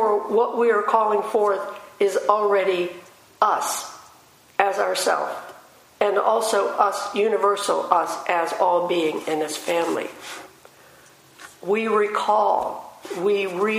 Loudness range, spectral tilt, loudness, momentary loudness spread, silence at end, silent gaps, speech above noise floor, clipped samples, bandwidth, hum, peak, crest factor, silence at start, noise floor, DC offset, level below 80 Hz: 4 LU; -3 dB/octave; -22 LUFS; 12 LU; 0 s; none; 31 dB; under 0.1%; 15.5 kHz; none; 0 dBFS; 22 dB; 0 s; -52 dBFS; under 0.1%; -72 dBFS